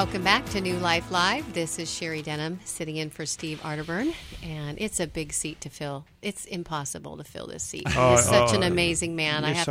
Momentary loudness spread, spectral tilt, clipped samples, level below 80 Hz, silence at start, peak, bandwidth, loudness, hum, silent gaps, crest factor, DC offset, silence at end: 15 LU; -3.5 dB/octave; under 0.1%; -48 dBFS; 0 s; -4 dBFS; 16 kHz; -26 LUFS; none; none; 24 dB; under 0.1%; 0 s